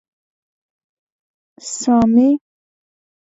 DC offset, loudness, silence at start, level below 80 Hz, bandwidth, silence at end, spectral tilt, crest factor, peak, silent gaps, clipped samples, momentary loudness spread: under 0.1%; -15 LUFS; 1.65 s; -52 dBFS; 8 kHz; 0.85 s; -5.5 dB/octave; 18 dB; -2 dBFS; none; under 0.1%; 16 LU